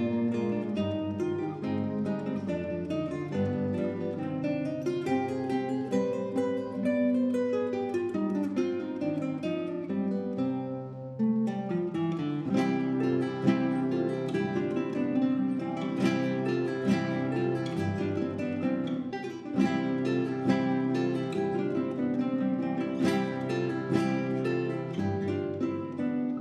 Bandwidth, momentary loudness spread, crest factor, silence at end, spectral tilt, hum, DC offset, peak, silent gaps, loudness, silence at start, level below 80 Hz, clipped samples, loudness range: 10 kHz; 5 LU; 18 dB; 0 s; -8 dB/octave; none; under 0.1%; -12 dBFS; none; -30 LUFS; 0 s; -68 dBFS; under 0.1%; 3 LU